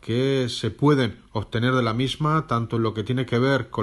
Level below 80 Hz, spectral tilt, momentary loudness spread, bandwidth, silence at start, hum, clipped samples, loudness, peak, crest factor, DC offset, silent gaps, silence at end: -50 dBFS; -6.5 dB/octave; 6 LU; 12 kHz; 0.05 s; none; under 0.1%; -23 LUFS; -6 dBFS; 18 dB; under 0.1%; none; 0 s